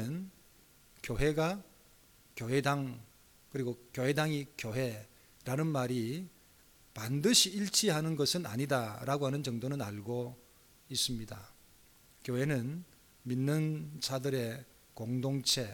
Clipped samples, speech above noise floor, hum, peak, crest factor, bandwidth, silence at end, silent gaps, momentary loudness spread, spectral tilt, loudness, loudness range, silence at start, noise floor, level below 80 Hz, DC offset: under 0.1%; 29 dB; none; -12 dBFS; 24 dB; 19 kHz; 0 s; none; 18 LU; -4 dB/octave; -34 LUFS; 7 LU; 0 s; -63 dBFS; -56 dBFS; under 0.1%